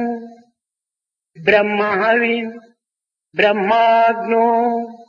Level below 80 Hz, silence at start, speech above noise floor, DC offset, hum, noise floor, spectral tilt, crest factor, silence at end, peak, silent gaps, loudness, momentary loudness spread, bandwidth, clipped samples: -62 dBFS; 0 s; 71 dB; under 0.1%; none; -86 dBFS; -6.5 dB/octave; 16 dB; 0.05 s; 0 dBFS; none; -16 LUFS; 11 LU; 6.8 kHz; under 0.1%